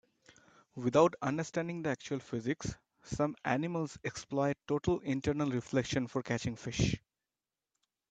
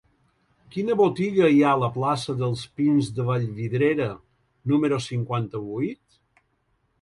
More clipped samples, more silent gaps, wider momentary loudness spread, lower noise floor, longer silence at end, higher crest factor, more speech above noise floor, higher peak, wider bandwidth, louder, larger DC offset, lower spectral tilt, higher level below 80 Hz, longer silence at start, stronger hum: neither; neither; second, 9 LU vs 12 LU; first, under -90 dBFS vs -70 dBFS; about the same, 1.15 s vs 1.05 s; first, 22 dB vs 16 dB; first, over 56 dB vs 47 dB; second, -12 dBFS vs -8 dBFS; second, 9.2 kHz vs 11.5 kHz; second, -34 LUFS vs -24 LUFS; neither; second, -6 dB/octave vs -7.5 dB/octave; about the same, -56 dBFS vs -60 dBFS; about the same, 0.75 s vs 0.75 s; neither